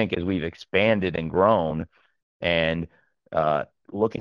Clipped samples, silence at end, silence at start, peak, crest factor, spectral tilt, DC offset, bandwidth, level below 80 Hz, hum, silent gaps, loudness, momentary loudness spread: under 0.1%; 0 s; 0 s; -4 dBFS; 20 dB; -7.5 dB/octave; under 0.1%; 7 kHz; -50 dBFS; none; 2.23-2.40 s; -24 LUFS; 12 LU